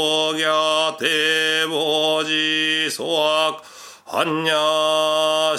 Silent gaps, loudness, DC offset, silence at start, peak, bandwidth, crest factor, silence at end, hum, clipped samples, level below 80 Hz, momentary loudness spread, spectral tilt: none; -18 LUFS; under 0.1%; 0 s; -2 dBFS; 16 kHz; 18 dB; 0 s; none; under 0.1%; -76 dBFS; 4 LU; -2 dB/octave